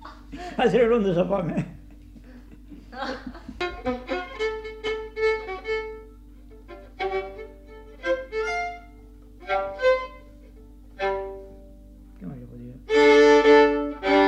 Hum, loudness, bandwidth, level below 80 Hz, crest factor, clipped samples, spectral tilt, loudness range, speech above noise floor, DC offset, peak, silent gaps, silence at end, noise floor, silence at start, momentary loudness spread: none; -23 LUFS; 8.4 kHz; -46 dBFS; 18 dB; under 0.1%; -5.5 dB/octave; 11 LU; 24 dB; under 0.1%; -6 dBFS; none; 0 s; -46 dBFS; 0 s; 25 LU